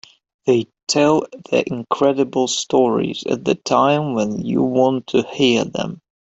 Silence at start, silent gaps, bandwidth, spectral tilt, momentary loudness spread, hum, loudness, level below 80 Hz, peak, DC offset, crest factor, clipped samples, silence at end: 0.45 s; 0.83-0.87 s; 8.2 kHz; -4.5 dB/octave; 6 LU; none; -18 LUFS; -58 dBFS; -2 dBFS; under 0.1%; 16 dB; under 0.1%; 0.3 s